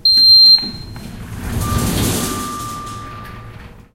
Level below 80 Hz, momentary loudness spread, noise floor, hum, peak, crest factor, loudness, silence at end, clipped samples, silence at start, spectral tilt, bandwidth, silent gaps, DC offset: -32 dBFS; 27 LU; -36 dBFS; none; -2 dBFS; 14 dB; -10 LUFS; 0.25 s; under 0.1%; 0.05 s; -3 dB/octave; 16.5 kHz; none; under 0.1%